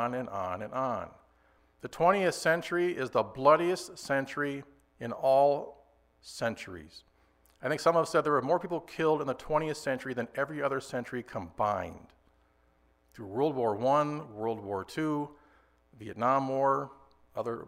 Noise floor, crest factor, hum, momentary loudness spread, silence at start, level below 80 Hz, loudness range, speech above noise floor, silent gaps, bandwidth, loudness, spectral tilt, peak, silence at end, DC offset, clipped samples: -67 dBFS; 22 dB; none; 17 LU; 0 s; -64 dBFS; 5 LU; 37 dB; none; 16 kHz; -30 LUFS; -5.5 dB/octave; -10 dBFS; 0 s; under 0.1%; under 0.1%